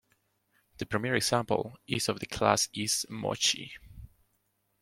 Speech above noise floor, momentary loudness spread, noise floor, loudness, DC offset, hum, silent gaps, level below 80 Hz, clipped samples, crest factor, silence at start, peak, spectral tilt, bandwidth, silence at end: 45 dB; 9 LU; -76 dBFS; -29 LUFS; under 0.1%; none; none; -60 dBFS; under 0.1%; 24 dB; 0.8 s; -8 dBFS; -3 dB/octave; 16.5 kHz; 0.75 s